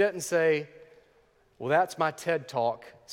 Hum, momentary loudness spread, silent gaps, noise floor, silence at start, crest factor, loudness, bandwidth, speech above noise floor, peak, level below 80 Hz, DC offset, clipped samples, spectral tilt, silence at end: none; 13 LU; none; -64 dBFS; 0 s; 18 dB; -28 LUFS; 17 kHz; 37 dB; -10 dBFS; -74 dBFS; under 0.1%; under 0.1%; -4.5 dB/octave; 0 s